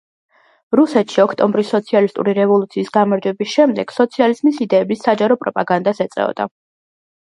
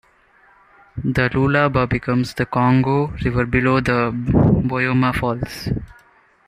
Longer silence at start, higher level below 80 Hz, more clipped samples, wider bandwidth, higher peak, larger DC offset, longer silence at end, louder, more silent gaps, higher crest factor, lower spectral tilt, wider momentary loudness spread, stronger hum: second, 0.7 s vs 0.95 s; second, -66 dBFS vs -36 dBFS; neither; second, 11 kHz vs 14.5 kHz; about the same, 0 dBFS vs -2 dBFS; neither; first, 0.75 s vs 0.55 s; first, -16 LUFS vs -19 LUFS; neither; about the same, 16 dB vs 18 dB; about the same, -6.5 dB/octave vs -7.5 dB/octave; second, 5 LU vs 9 LU; neither